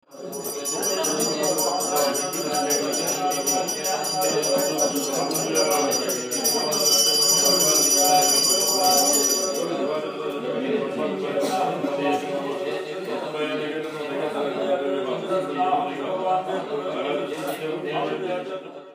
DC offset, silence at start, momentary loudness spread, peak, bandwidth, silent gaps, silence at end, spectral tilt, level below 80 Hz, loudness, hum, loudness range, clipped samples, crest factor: under 0.1%; 0.1 s; 13 LU; -6 dBFS; 15.5 kHz; none; 0 s; -1.5 dB/octave; -80 dBFS; -22 LUFS; none; 9 LU; under 0.1%; 18 dB